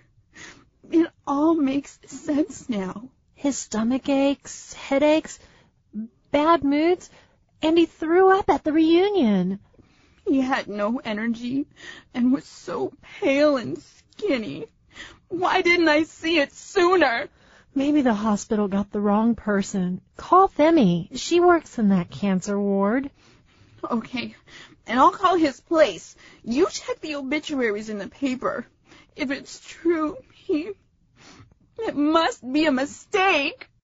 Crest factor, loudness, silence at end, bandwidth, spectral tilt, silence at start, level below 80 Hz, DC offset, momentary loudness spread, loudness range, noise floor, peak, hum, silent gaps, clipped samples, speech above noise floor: 18 dB; -22 LUFS; 0.3 s; 8 kHz; -4 dB/octave; 0.35 s; -56 dBFS; under 0.1%; 17 LU; 6 LU; -56 dBFS; -4 dBFS; none; none; under 0.1%; 34 dB